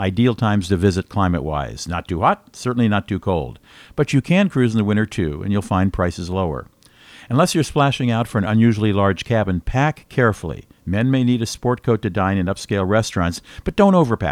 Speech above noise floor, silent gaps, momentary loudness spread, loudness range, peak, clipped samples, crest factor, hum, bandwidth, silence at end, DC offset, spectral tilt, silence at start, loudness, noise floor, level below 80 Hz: 28 dB; none; 9 LU; 2 LU; 0 dBFS; under 0.1%; 18 dB; none; 15 kHz; 0 s; under 0.1%; -6.5 dB/octave; 0 s; -19 LUFS; -46 dBFS; -38 dBFS